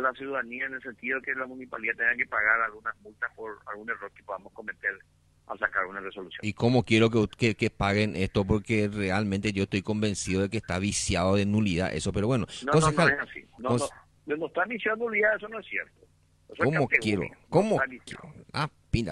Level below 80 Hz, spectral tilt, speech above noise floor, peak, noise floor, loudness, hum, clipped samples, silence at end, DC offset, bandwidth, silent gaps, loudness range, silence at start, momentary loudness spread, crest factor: -50 dBFS; -5 dB/octave; 32 dB; -6 dBFS; -60 dBFS; -28 LUFS; none; under 0.1%; 0 s; under 0.1%; 12 kHz; none; 5 LU; 0 s; 14 LU; 22 dB